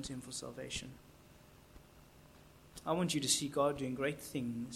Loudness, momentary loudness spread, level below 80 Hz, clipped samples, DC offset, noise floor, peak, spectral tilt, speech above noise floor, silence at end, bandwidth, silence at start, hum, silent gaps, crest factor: -37 LUFS; 15 LU; -64 dBFS; under 0.1%; under 0.1%; -60 dBFS; -18 dBFS; -3.5 dB/octave; 23 dB; 0 s; 16.5 kHz; 0 s; none; none; 22 dB